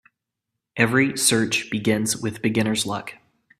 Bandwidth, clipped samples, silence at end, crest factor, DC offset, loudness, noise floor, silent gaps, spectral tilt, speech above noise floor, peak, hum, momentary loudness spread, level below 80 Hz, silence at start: 15.5 kHz; under 0.1%; 0.45 s; 22 dB; under 0.1%; -21 LUFS; -83 dBFS; none; -3.5 dB/octave; 61 dB; -2 dBFS; none; 11 LU; -60 dBFS; 0.75 s